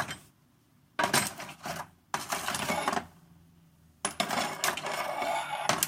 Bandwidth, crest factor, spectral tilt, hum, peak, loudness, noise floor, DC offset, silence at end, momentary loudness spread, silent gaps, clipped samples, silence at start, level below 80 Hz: 16.5 kHz; 28 dB; -2 dB/octave; none; -6 dBFS; -32 LUFS; -65 dBFS; under 0.1%; 0 s; 12 LU; none; under 0.1%; 0 s; -68 dBFS